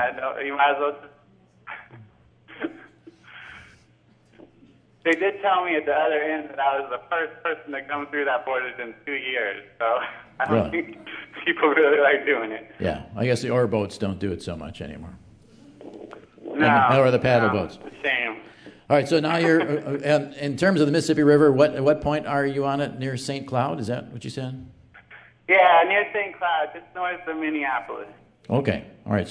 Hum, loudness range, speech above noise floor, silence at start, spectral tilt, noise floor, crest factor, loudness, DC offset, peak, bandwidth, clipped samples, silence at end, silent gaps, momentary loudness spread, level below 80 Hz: none; 8 LU; 35 dB; 0 s; -6 dB/octave; -58 dBFS; 20 dB; -23 LUFS; under 0.1%; -4 dBFS; 11 kHz; under 0.1%; 0 s; none; 19 LU; -56 dBFS